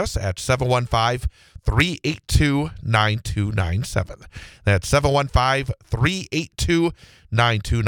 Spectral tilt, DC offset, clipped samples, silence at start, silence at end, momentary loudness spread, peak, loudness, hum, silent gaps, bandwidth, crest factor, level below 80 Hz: -5 dB/octave; under 0.1%; under 0.1%; 0 s; 0 s; 8 LU; -2 dBFS; -21 LUFS; none; none; 18.5 kHz; 20 dB; -32 dBFS